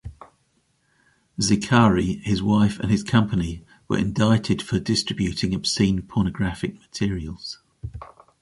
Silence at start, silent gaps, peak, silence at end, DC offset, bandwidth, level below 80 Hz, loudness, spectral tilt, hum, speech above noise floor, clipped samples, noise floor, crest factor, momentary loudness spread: 0.05 s; none; -4 dBFS; 0.35 s; under 0.1%; 11.5 kHz; -42 dBFS; -22 LUFS; -5.5 dB/octave; none; 45 dB; under 0.1%; -67 dBFS; 20 dB; 18 LU